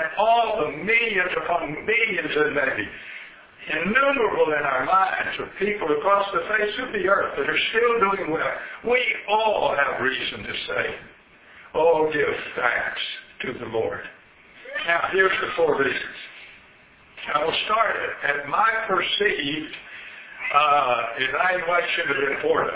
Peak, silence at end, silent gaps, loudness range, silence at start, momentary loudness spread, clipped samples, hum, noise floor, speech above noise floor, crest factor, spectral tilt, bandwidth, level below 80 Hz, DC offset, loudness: -4 dBFS; 0 s; none; 3 LU; 0 s; 12 LU; under 0.1%; none; -52 dBFS; 29 dB; 18 dB; -7 dB/octave; 4 kHz; -56 dBFS; under 0.1%; -22 LUFS